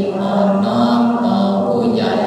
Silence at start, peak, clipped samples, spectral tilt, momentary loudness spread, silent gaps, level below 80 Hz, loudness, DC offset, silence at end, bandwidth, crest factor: 0 s; -4 dBFS; under 0.1%; -7.5 dB/octave; 2 LU; none; -56 dBFS; -15 LUFS; under 0.1%; 0 s; 9.8 kHz; 12 dB